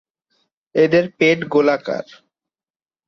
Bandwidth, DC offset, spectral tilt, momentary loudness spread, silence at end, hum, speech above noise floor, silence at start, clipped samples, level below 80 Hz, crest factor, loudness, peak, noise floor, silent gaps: 7 kHz; under 0.1%; -6 dB/octave; 10 LU; 1.05 s; none; over 73 dB; 0.75 s; under 0.1%; -64 dBFS; 18 dB; -17 LUFS; -2 dBFS; under -90 dBFS; none